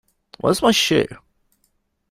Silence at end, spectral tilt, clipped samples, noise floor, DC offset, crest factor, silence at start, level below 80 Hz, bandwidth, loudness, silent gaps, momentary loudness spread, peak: 0.95 s; -3.5 dB/octave; under 0.1%; -68 dBFS; under 0.1%; 20 dB; 0.45 s; -52 dBFS; 16 kHz; -18 LUFS; none; 9 LU; -2 dBFS